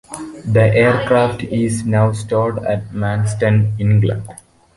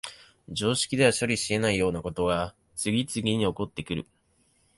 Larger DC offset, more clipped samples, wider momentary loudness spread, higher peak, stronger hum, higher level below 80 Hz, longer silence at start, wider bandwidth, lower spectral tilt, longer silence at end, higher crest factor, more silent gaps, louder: neither; neither; second, 8 LU vs 12 LU; first, -2 dBFS vs -8 dBFS; neither; first, -42 dBFS vs -52 dBFS; about the same, 0.1 s vs 0.05 s; about the same, 11.5 kHz vs 12 kHz; first, -7 dB/octave vs -4 dB/octave; second, 0.45 s vs 0.75 s; second, 14 dB vs 20 dB; neither; first, -16 LUFS vs -27 LUFS